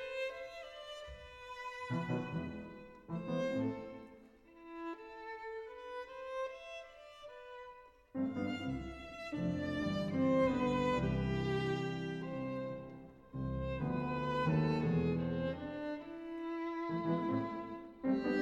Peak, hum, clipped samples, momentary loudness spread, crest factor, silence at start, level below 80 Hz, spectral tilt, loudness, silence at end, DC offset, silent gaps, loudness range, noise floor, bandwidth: -22 dBFS; none; under 0.1%; 18 LU; 18 dB; 0 s; -56 dBFS; -7.5 dB/octave; -39 LUFS; 0 s; under 0.1%; none; 11 LU; -60 dBFS; 9.6 kHz